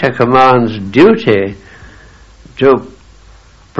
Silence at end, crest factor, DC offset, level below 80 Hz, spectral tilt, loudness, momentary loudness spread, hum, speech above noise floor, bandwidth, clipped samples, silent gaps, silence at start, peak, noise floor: 0 s; 12 dB; under 0.1%; -42 dBFS; -7.5 dB/octave; -10 LUFS; 7 LU; none; 31 dB; 7.8 kHz; 0.4%; none; 0 s; 0 dBFS; -41 dBFS